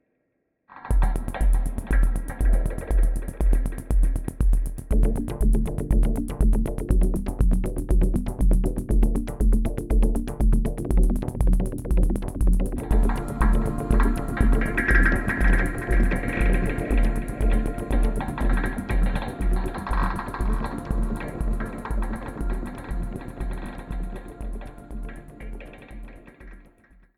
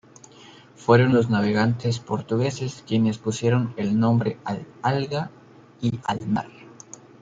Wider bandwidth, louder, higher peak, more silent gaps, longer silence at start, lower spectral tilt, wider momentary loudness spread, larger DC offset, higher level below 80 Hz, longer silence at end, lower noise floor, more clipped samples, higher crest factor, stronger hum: first, 12.5 kHz vs 7.8 kHz; second, -26 LUFS vs -23 LUFS; second, -6 dBFS vs -2 dBFS; neither; about the same, 0.7 s vs 0.8 s; about the same, -7 dB/octave vs -7 dB/octave; about the same, 11 LU vs 12 LU; neither; first, -22 dBFS vs -60 dBFS; about the same, 0.6 s vs 0.55 s; first, -74 dBFS vs -48 dBFS; neither; about the same, 16 dB vs 20 dB; neither